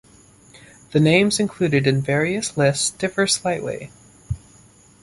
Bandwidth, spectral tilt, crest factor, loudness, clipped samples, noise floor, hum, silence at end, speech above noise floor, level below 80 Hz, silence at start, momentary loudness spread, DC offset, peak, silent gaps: 11.5 kHz; -4.5 dB/octave; 22 dB; -19 LUFS; under 0.1%; -51 dBFS; none; 0.65 s; 31 dB; -48 dBFS; 0.55 s; 16 LU; under 0.1%; 0 dBFS; none